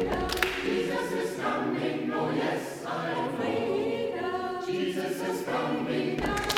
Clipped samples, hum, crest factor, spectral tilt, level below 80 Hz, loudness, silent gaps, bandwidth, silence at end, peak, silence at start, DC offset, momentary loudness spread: under 0.1%; none; 24 dB; -4.5 dB/octave; -50 dBFS; -30 LUFS; none; 20 kHz; 0 s; -4 dBFS; 0 s; under 0.1%; 4 LU